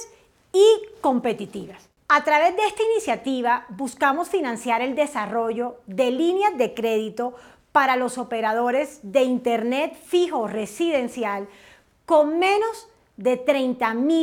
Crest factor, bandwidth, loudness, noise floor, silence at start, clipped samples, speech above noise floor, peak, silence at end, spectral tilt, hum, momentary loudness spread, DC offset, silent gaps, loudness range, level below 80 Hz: 18 dB; 17.5 kHz; -22 LUFS; -53 dBFS; 0 s; under 0.1%; 31 dB; -4 dBFS; 0 s; -4 dB/octave; none; 11 LU; under 0.1%; none; 3 LU; -66 dBFS